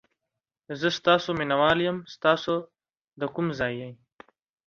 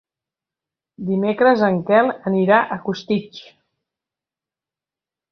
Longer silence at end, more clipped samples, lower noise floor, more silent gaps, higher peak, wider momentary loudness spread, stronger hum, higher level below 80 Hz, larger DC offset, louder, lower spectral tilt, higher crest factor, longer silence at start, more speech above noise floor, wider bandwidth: second, 0.75 s vs 1.9 s; neither; about the same, -86 dBFS vs -89 dBFS; first, 3.01-3.08 s vs none; second, -6 dBFS vs 0 dBFS; about the same, 12 LU vs 10 LU; neither; about the same, -60 dBFS vs -64 dBFS; neither; second, -25 LUFS vs -18 LUFS; second, -5.5 dB/octave vs -7.5 dB/octave; about the same, 22 dB vs 20 dB; second, 0.7 s vs 1 s; second, 61 dB vs 72 dB; first, 7.4 kHz vs 6.4 kHz